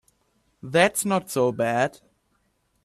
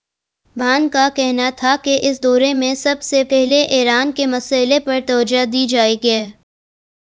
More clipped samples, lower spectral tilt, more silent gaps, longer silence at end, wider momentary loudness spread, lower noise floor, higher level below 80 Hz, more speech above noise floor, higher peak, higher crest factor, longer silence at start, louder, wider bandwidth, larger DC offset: neither; first, -4 dB/octave vs -2.5 dB/octave; neither; first, 0.95 s vs 0.75 s; first, 7 LU vs 4 LU; first, -69 dBFS vs -65 dBFS; second, -64 dBFS vs -56 dBFS; about the same, 47 dB vs 50 dB; second, -4 dBFS vs 0 dBFS; about the same, 20 dB vs 16 dB; about the same, 0.65 s vs 0.55 s; second, -23 LUFS vs -15 LUFS; first, 15.5 kHz vs 8 kHz; neither